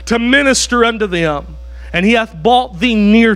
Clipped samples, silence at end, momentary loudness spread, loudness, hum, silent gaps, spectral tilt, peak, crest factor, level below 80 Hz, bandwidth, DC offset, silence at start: under 0.1%; 0 s; 10 LU; -12 LUFS; none; none; -4 dB/octave; 0 dBFS; 12 dB; -32 dBFS; 13 kHz; under 0.1%; 0 s